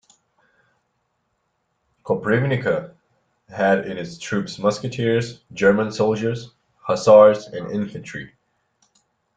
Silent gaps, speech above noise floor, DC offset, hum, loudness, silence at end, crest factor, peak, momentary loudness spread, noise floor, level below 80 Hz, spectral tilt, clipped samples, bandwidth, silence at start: none; 52 dB; under 0.1%; none; -20 LUFS; 1.1 s; 20 dB; -2 dBFS; 19 LU; -72 dBFS; -58 dBFS; -6 dB/octave; under 0.1%; 9 kHz; 2.05 s